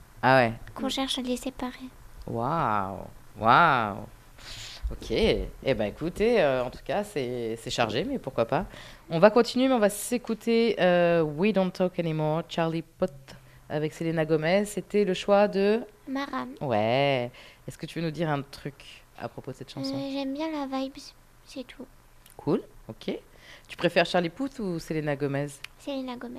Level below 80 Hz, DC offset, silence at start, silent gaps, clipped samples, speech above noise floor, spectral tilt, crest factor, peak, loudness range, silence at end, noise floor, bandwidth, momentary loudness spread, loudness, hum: -48 dBFS; under 0.1%; 0.15 s; none; under 0.1%; 23 dB; -5.5 dB/octave; 22 dB; -4 dBFS; 10 LU; 0 s; -50 dBFS; 14.5 kHz; 18 LU; -27 LUFS; none